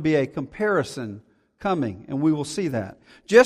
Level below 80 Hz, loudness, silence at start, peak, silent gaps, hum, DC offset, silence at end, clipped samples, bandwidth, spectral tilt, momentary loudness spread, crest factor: -58 dBFS; -25 LUFS; 0 s; -2 dBFS; none; none; under 0.1%; 0 s; under 0.1%; 13 kHz; -6 dB/octave; 12 LU; 20 dB